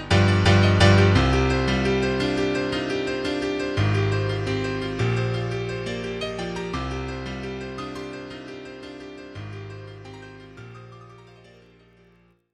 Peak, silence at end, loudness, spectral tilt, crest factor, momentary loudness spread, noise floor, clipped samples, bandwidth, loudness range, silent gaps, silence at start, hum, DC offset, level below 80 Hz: -2 dBFS; 1.3 s; -23 LUFS; -6 dB/octave; 22 dB; 22 LU; -58 dBFS; under 0.1%; 10.5 kHz; 20 LU; none; 0 s; none; under 0.1%; -38 dBFS